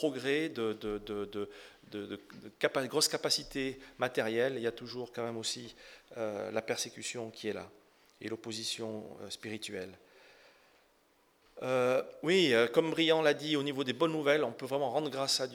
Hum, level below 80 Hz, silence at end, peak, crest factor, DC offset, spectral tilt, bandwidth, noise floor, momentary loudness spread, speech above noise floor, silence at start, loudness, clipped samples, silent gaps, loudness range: none; -68 dBFS; 0 s; -12 dBFS; 22 dB; under 0.1%; -3.5 dB/octave; 18 kHz; -69 dBFS; 16 LU; 36 dB; 0 s; -33 LUFS; under 0.1%; none; 12 LU